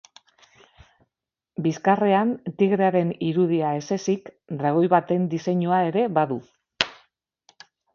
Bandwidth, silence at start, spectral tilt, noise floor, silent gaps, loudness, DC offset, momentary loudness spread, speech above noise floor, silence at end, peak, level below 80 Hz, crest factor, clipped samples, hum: 7.4 kHz; 1.6 s; -6.5 dB/octave; -85 dBFS; none; -23 LUFS; under 0.1%; 8 LU; 63 dB; 1 s; 0 dBFS; -66 dBFS; 24 dB; under 0.1%; none